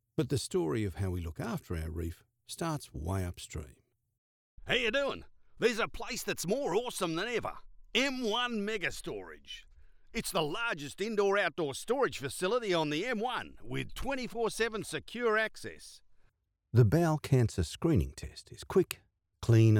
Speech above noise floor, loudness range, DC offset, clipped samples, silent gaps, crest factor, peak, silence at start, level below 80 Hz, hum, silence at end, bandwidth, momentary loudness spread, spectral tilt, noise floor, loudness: 38 dB; 5 LU; under 0.1%; under 0.1%; 4.18-4.58 s; 20 dB; -14 dBFS; 0.2 s; -52 dBFS; none; 0 s; 18 kHz; 15 LU; -5.5 dB/octave; -70 dBFS; -33 LUFS